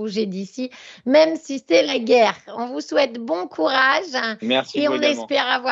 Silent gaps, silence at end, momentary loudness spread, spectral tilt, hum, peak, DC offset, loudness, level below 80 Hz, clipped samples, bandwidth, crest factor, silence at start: none; 0 s; 13 LU; -3.5 dB/octave; none; -2 dBFS; under 0.1%; -20 LUFS; -74 dBFS; under 0.1%; 7.8 kHz; 18 dB; 0 s